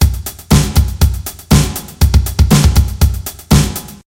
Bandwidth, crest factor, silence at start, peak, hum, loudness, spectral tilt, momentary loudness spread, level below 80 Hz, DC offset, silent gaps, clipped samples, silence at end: 17.5 kHz; 12 dB; 0 s; 0 dBFS; none; -13 LUFS; -5 dB/octave; 9 LU; -16 dBFS; under 0.1%; none; under 0.1%; 0.15 s